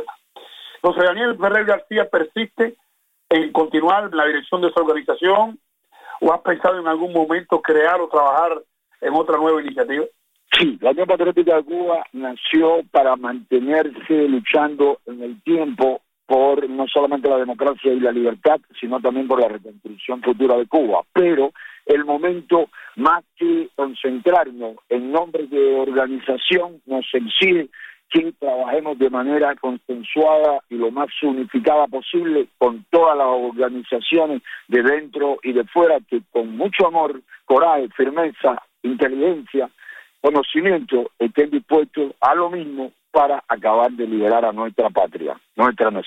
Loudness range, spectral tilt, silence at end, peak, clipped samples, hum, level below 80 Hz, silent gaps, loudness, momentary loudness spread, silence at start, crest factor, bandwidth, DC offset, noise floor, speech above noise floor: 2 LU; -6 dB/octave; 0 s; -2 dBFS; under 0.1%; none; -62 dBFS; none; -19 LUFS; 8 LU; 0 s; 16 dB; 8.2 kHz; under 0.1%; -43 dBFS; 25 dB